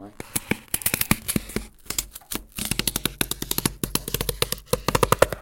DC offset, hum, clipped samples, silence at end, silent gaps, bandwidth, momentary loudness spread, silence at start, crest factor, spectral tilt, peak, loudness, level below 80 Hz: under 0.1%; none; under 0.1%; 0 s; none; 17.5 kHz; 8 LU; 0 s; 26 dB; -3 dB/octave; 0 dBFS; -25 LUFS; -40 dBFS